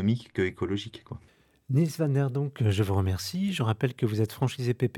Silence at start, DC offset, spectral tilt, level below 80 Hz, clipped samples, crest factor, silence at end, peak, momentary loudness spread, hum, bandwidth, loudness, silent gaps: 0 s; under 0.1%; -7 dB/octave; -64 dBFS; under 0.1%; 16 dB; 0 s; -12 dBFS; 7 LU; none; 18 kHz; -28 LUFS; none